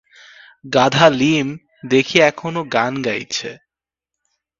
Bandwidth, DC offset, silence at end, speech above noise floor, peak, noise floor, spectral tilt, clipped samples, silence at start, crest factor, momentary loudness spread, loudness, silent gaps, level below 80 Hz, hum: 7.8 kHz; under 0.1%; 1.05 s; 69 dB; 0 dBFS; -85 dBFS; -4.5 dB/octave; under 0.1%; 0.65 s; 18 dB; 12 LU; -16 LUFS; none; -56 dBFS; none